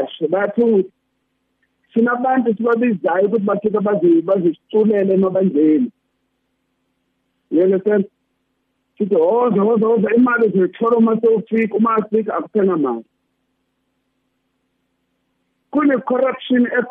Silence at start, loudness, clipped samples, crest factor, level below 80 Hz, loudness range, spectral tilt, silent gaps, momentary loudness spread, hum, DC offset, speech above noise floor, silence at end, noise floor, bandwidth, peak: 0 s; -16 LUFS; under 0.1%; 12 dB; -68 dBFS; 7 LU; -10 dB/octave; none; 6 LU; 60 Hz at -50 dBFS; under 0.1%; 54 dB; 0 s; -70 dBFS; 3.8 kHz; -6 dBFS